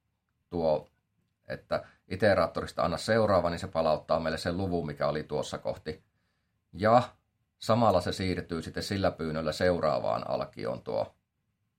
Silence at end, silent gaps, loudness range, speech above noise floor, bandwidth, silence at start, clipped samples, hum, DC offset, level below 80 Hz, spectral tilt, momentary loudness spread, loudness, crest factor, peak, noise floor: 0.7 s; none; 3 LU; 50 dB; 16 kHz; 0.5 s; under 0.1%; none; under 0.1%; -58 dBFS; -6 dB/octave; 12 LU; -30 LUFS; 20 dB; -10 dBFS; -79 dBFS